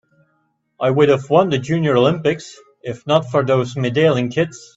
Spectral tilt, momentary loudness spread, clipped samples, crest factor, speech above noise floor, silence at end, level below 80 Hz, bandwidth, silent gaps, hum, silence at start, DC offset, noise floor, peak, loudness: -6.5 dB/octave; 13 LU; under 0.1%; 18 dB; 49 dB; 0.2 s; -56 dBFS; 8 kHz; none; none; 0.8 s; under 0.1%; -66 dBFS; 0 dBFS; -17 LUFS